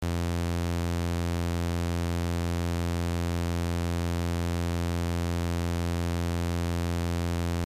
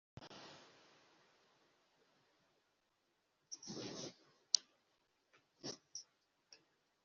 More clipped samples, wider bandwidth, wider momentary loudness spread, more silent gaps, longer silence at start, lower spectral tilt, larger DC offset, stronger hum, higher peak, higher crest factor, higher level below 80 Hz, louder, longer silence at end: neither; first, 15.5 kHz vs 7.2 kHz; second, 0 LU vs 28 LU; neither; second, 0 s vs 0.15 s; first, -6 dB/octave vs -1.5 dB/octave; neither; neither; second, -18 dBFS vs -12 dBFS; second, 10 dB vs 40 dB; first, -38 dBFS vs -88 dBFS; first, -30 LUFS vs -44 LUFS; second, 0 s vs 0.5 s